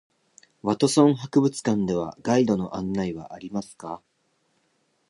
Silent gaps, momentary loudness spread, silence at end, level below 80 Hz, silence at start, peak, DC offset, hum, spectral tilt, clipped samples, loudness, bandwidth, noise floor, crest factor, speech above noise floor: none; 17 LU; 1.1 s; -58 dBFS; 0.65 s; -4 dBFS; under 0.1%; none; -6 dB/octave; under 0.1%; -24 LUFS; 11.5 kHz; -70 dBFS; 22 dB; 46 dB